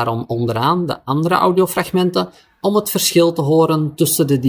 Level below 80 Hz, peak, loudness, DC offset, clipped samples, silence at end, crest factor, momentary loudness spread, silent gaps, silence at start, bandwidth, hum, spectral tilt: -56 dBFS; 0 dBFS; -16 LUFS; under 0.1%; under 0.1%; 0 s; 16 dB; 6 LU; none; 0 s; 19 kHz; none; -5 dB/octave